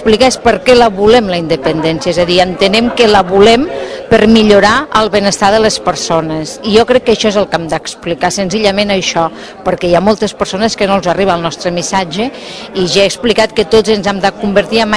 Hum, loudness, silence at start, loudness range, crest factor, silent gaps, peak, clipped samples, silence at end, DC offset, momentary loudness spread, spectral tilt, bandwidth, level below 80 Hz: none; -10 LUFS; 0 s; 4 LU; 10 dB; none; 0 dBFS; 2%; 0 s; under 0.1%; 9 LU; -4 dB/octave; 11 kHz; -36 dBFS